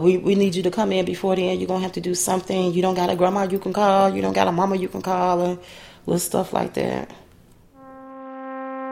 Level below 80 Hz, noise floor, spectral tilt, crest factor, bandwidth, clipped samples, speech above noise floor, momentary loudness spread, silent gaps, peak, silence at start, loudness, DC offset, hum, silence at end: -54 dBFS; -51 dBFS; -5 dB/octave; 20 dB; 16 kHz; under 0.1%; 30 dB; 15 LU; none; -2 dBFS; 0 s; -21 LUFS; under 0.1%; none; 0 s